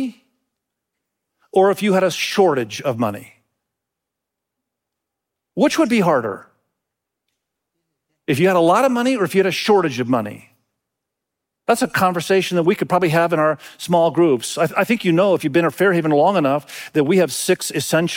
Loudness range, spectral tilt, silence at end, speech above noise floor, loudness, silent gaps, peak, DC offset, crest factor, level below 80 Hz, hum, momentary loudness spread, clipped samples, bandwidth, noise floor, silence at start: 5 LU; -5 dB/octave; 0 s; 65 dB; -17 LUFS; none; -4 dBFS; under 0.1%; 16 dB; -64 dBFS; none; 8 LU; under 0.1%; 17 kHz; -82 dBFS; 0 s